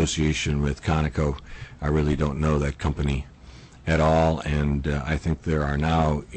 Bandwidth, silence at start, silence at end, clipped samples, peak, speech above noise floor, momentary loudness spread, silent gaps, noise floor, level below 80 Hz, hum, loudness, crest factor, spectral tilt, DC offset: 8.6 kHz; 0 s; 0 s; under 0.1%; -12 dBFS; 22 dB; 8 LU; none; -46 dBFS; -32 dBFS; none; -24 LUFS; 12 dB; -6 dB/octave; under 0.1%